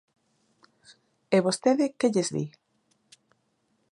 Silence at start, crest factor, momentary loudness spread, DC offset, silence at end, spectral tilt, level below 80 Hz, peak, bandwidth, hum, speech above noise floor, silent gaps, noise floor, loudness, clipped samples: 1.3 s; 22 dB; 9 LU; under 0.1%; 1.45 s; -5 dB/octave; -76 dBFS; -8 dBFS; 11.5 kHz; none; 48 dB; none; -72 dBFS; -26 LUFS; under 0.1%